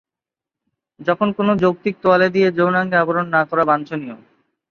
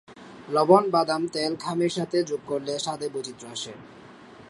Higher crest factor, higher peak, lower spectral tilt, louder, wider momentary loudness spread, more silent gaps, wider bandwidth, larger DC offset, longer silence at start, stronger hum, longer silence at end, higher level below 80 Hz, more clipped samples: second, 16 dB vs 22 dB; about the same, -2 dBFS vs -4 dBFS; first, -8 dB/octave vs -5 dB/octave; first, -17 LUFS vs -25 LUFS; second, 10 LU vs 16 LU; neither; second, 6.8 kHz vs 11.5 kHz; neither; first, 1 s vs 0.1 s; neither; first, 0.55 s vs 0.05 s; first, -60 dBFS vs -70 dBFS; neither